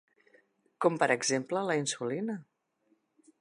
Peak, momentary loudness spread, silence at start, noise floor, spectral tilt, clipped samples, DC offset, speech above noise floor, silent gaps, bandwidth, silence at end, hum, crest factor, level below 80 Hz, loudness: -10 dBFS; 9 LU; 0.8 s; -74 dBFS; -3.5 dB/octave; under 0.1%; under 0.1%; 43 dB; none; 11 kHz; 0.95 s; none; 22 dB; -86 dBFS; -30 LUFS